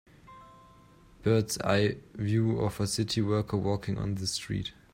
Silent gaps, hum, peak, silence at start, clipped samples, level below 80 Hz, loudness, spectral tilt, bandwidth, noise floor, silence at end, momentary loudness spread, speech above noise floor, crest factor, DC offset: none; none; -12 dBFS; 0.3 s; under 0.1%; -54 dBFS; -30 LUFS; -5.5 dB/octave; 16 kHz; -56 dBFS; 0.25 s; 6 LU; 28 dB; 18 dB; under 0.1%